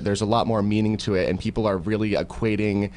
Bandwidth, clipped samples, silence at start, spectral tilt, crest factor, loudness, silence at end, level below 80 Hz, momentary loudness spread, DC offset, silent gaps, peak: 10.5 kHz; under 0.1%; 0 s; -6.5 dB/octave; 16 dB; -23 LUFS; 0 s; -42 dBFS; 3 LU; under 0.1%; none; -8 dBFS